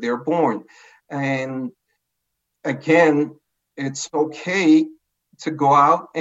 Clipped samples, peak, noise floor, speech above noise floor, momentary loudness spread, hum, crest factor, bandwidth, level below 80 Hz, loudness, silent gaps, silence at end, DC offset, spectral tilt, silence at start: under 0.1%; -2 dBFS; -77 dBFS; 58 dB; 15 LU; none; 18 dB; 8 kHz; -78 dBFS; -19 LUFS; none; 0 s; under 0.1%; -5.5 dB/octave; 0 s